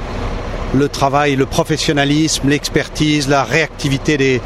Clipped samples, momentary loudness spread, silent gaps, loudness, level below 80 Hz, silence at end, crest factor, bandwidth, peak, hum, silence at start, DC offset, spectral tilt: under 0.1%; 5 LU; none; -15 LUFS; -30 dBFS; 0 s; 16 dB; 14 kHz; 0 dBFS; none; 0 s; under 0.1%; -4.5 dB/octave